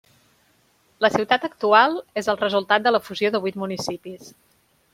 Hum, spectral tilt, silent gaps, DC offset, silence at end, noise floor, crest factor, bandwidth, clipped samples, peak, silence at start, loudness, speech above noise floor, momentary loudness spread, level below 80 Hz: none; -4 dB/octave; none; under 0.1%; 0.65 s; -62 dBFS; 20 dB; 16 kHz; under 0.1%; -2 dBFS; 1 s; -21 LUFS; 40 dB; 13 LU; -66 dBFS